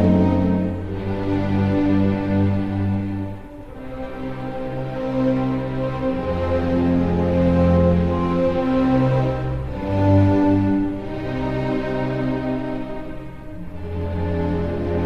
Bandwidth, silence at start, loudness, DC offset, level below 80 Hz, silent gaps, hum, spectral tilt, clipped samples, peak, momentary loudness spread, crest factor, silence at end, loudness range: 6.8 kHz; 0 s; -21 LUFS; under 0.1%; -32 dBFS; none; none; -9.5 dB/octave; under 0.1%; -6 dBFS; 14 LU; 14 dB; 0 s; 7 LU